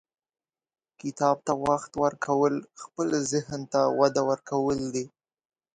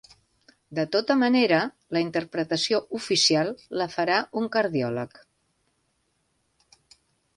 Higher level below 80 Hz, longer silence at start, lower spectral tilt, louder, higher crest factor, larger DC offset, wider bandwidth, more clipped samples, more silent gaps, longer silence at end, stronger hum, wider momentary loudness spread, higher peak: first, -62 dBFS vs -68 dBFS; first, 1.05 s vs 0.7 s; about the same, -5 dB/octave vs -4 dB/octave; second, -27 LUFS vs -24 LUFS; about the same, 20 dB vs 18 dB; neither; about the same, 10.5 kHz vs 11.5 kHz; neither; neither; second, 0.7 s vs 2.3 s; neither; about the same, 11 LU vs 10 LU; about the same, -8 dBFS vs -8 dBFS